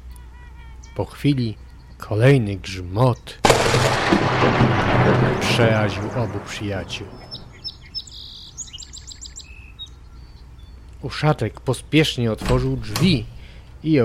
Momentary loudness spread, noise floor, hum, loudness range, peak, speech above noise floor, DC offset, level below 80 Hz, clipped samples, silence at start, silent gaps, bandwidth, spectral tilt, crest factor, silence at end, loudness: 20 LU; -41 dBFS; none; 17 LU; 0 dBFS; 22 dB; under 0.1%; -38 dBFS; under 0.1%; 0.05 s; none; 15 kHz; -5.5 dB/octave; 20 dB; 0 s; -20 LUFS